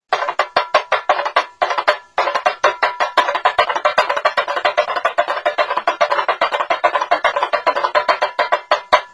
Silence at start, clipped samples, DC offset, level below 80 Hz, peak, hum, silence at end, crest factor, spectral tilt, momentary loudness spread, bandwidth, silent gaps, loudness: 0.1 s; under 0.1%; under 0.1%; -60 dBFS; 0 dBFS; none; 0.05 s; 18 dB; -1 dB/octave; 2 LU; 11 kHz; none; -17 LUFS